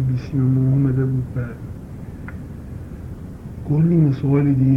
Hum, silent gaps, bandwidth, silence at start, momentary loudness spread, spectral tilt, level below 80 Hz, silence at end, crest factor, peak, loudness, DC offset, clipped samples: none; none; 5.4 kHz; 0 s; 18 LU; -11 dB/octave; -38 dBFS; 0 s; 14 dB; -6 dBFS; -19 LUFS; under 0.1%; under 0.1%